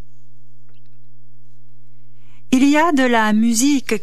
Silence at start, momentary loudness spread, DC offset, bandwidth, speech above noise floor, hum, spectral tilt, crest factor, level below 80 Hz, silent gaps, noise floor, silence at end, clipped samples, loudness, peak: 2.5 s; 3 LU; 7%; 14.5 kHz; 37 dB; none; -3.5 dB/octave; 16 dB; -56 dBFS; none; -52 dBFS; 0.05 s; under 0.1%; -15 LUFS; -2 dBFS